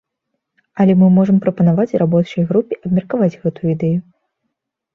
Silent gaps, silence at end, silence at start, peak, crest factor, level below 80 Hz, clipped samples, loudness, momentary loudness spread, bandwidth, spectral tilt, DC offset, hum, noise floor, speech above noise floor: none; 0.95 s; 0.75 s; -2 dBFS; 14 dB; -54 dBFS; under 0.1%; -15 LUFS; 8 LU; 5.8 kHz; -10.5 dB/octave; under 0.1%; none; -75 dBFS; 61 dB